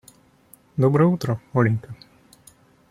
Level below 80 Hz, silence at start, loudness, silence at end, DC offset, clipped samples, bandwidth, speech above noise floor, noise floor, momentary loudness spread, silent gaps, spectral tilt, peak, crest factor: -58 dBFS; 0.75 s; -21 LUFS; 0.95 s; under 0.1%; under 0.1%; 15 kHz; 34 dB; -54 dBFS; 20 LU; none; -8.5 dB/octave; -4 dBFS; 18 dB